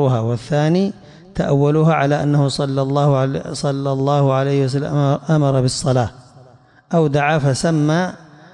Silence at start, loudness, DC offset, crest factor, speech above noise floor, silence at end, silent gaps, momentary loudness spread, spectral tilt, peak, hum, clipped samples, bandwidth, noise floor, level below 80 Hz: 0 s; -17 LUFS; under 0.1%; 12 dB; 31 dB; 0.35 s; none; 6 LU; -6.5 dB/octave; -6 dBFS; none; under 0.1%; 11 kHz; -47 dBFS; -48 dBFS